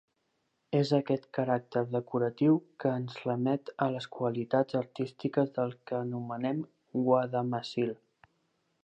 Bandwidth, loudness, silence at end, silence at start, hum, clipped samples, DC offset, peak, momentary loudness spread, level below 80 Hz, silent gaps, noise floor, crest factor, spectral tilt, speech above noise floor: 8.8 kHz; -31 LUFS; 0.9 s; 0.7 s; none; under 0.1%; under 0.1%; -12 dBFS; 8 LU; -80 dBFS; none; -78 dBFS; 18 dB; -8 dB/octave; 47 dB